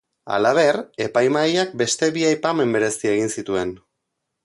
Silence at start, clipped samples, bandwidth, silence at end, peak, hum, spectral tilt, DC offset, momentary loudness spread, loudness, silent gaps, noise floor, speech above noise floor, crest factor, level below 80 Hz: 0.25 s; under 0.1%; 11.5 kHz; 0.7 s; -4 dBFS; none; -4 dB/octave; under 0.1%; 7 LU; -20 LUFS; none; -78 dBFS; 58 dB; 16 dB; -60 dBFS